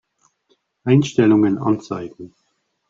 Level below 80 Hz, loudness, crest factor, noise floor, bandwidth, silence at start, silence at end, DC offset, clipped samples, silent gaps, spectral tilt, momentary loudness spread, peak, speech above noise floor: -56 dBFS; -18 LUFS; 18 dB; -69 dBFS; 7.6 kHz; 0.85 s; 0.65 s; under 0.1%; under 0.1%; none; -7.5 dB/octave; 15 LU; -2 dBFS; 52 dB